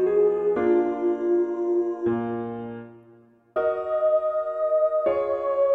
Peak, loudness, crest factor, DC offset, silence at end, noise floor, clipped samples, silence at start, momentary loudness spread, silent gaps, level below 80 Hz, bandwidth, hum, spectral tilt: -12 dBFS; -24 LUFS; 12 dB; under 0.1%; 0 s; -54 dBFS; under 0.1%; 0 s; 10 LU; none; -62 dBFS; 3.8 kHz; none; -9 dB/octave